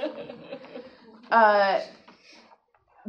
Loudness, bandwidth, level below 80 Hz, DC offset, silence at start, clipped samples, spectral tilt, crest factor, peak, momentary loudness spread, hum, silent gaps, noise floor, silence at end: -22 LUFS; 6.8 kHz; -78 dBFS; under 0.1%; 0 s; under 0.1%; -5 dB/octave; 20 dB; -6 dBFS; 24 LU; none; none; -61 dBFS; 1.2 s